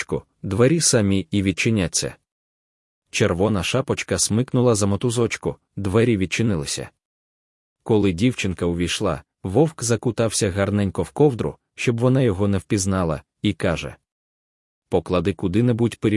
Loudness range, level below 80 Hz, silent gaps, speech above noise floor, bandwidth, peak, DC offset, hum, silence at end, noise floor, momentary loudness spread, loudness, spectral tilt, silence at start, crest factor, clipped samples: 3 LU; -50 dBFS; 2.32-3.02 s, 7.05-7.76 s, 14.12-14.82 s; over 70 dB; 12 kHz; -4 dBFS; under 0.1%; none; 0 s; under -90 dBFS; 10 LU; -21 LUFS; -5 dB/octave; 0 s; 18 dB; under 0.1%